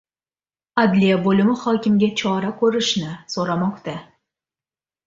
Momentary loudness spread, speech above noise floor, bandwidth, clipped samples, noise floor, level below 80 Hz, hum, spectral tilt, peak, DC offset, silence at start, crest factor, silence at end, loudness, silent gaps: 10 LU; over 71 dB; 7.8 kHz; under 0.1%; under -90 dBFS; -60 dBFS; none; -5.5 dB/octave; -4 dBFS; under 0.1%; 0.75 s; 18 dB; 1.05 s; -19 LUFS; none